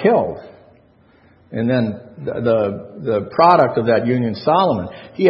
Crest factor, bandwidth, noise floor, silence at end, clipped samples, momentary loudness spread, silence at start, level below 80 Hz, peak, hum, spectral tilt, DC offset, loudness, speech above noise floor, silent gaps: 18 dB; 5.8 kHz; -52 dBFS; 0 s; under 0.1%; 15 LU; 0 s; -56 dBFS; 0 dBFS; none; -9.5 dB/octave; under 0.1%; -17 LUFS; 35 dB; none